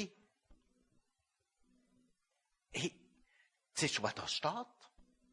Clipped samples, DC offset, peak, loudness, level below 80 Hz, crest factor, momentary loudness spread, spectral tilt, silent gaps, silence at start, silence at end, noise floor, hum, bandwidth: under 0.1%; under 0.1%; -20 dBFS; -39 LUFS; -76 dBFS; 26 dB; 11 LU; -3 dB/octave; none; 0 s; 0.3 s; -85 dBFS; none; 11.5 kHz